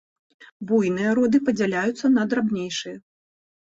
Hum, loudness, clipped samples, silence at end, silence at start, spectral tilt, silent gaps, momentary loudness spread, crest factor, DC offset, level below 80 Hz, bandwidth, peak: none; -22 LUFS; under 0.1%; 0.65 s; 0.4 s; -5.5 dB/octave; 0.52-0.60 s; 13 LU; 14 dB; under 0.1%; -64 dBFS; 8 kHz; -8 dBFS